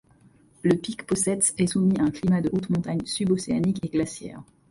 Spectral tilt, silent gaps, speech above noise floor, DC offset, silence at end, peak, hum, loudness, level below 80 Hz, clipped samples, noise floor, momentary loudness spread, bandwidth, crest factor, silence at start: -5.5 dB/octave; none; 33 dB; under 0.1%; 0.25 s; -8 dBFS; none; -24 LUFS; -54 dBFS; under 0.1%; -57 dBFS; 7 LU; 11.5 kHz; 18 dB; 0.65 s